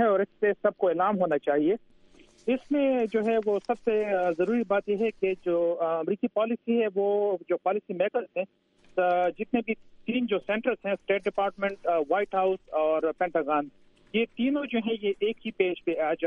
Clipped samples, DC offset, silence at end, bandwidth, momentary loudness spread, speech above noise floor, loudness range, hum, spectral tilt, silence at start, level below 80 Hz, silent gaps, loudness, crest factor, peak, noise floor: under 0.1%; under 0.1%; 0 s; 7 kHz; 5 LU; 29 dB; 2 LU; none; -7.5 dB/octave; 0 s; -66 dBFS; none; -27 LUFS; 16 dB; -10 dBFS; -56 dBFS